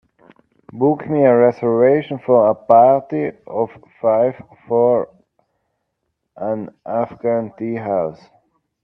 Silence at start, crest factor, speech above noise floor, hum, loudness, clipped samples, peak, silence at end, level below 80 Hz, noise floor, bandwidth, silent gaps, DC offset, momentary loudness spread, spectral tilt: 0.75 s; 18 dB; 58 dB; none; -17 LUFS; under 0.1%; 0 dBFS; 0.7 s; -62 dBFS; -74 dBFS; 5.6 kHz; none; under 0.1%; 12 LU; -10.5 dB/octave